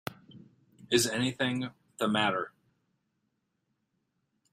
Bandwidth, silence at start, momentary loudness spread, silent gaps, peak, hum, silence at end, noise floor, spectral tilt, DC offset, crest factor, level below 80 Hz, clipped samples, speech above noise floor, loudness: 15.5 kHz; 0.1 s; 14 LU; none; -10 dBFS; none; 2.05 s; -80 dBFS; -3.5 dB/octave; under 0.1%; 24 dB; -70 dBFS; under 0.1%; 50 dB; -30 LUFS